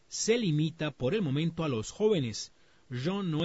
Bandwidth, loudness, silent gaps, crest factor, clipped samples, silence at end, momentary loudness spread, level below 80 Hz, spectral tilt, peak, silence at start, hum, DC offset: 8 kHz; -31 LUFS; none; 16 dB; under 0.1%; 0 s; 9 LU; -60 dBFS; -5.5 dB/octave; -16 dBFS; 0.1 s; none; under 0.1%